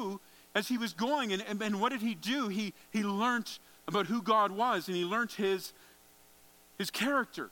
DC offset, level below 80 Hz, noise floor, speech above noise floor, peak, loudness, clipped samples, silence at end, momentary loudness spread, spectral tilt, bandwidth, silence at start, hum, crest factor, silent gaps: under 0.1%; -78 dBFS; -61 dBFS; 28 dB; -14 dBFS; -33 LUFS; under 0.1%; 0 s; 8 LU; -4 dB/octave; 17.5 kHz; 0 s; none; 20 dB; none